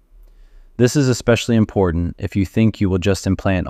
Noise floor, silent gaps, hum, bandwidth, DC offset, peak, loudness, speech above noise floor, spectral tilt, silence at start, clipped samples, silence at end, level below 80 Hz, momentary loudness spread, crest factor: -45 dBFS; none; none; 15 kHz; under 0.1%; -2 dBFS; -18 LUFS; 28 dB; -6 dB/octave; 0.8 s; under 0.1%; 0 s; -36 dBFS; 6 LU; 16 dB